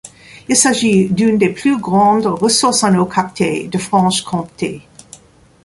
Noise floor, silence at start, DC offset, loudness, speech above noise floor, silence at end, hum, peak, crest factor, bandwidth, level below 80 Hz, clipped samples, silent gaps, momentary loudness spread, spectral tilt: -43 dBFS; 0.05 s; under 0.1%; -14 LUFS; 29 dB; 0.85 s; none; 0 dBFS; 14 dB; 11.5 kHz; -52 dBFS; under 0.1%; none; 11 LU; -4 dB/octave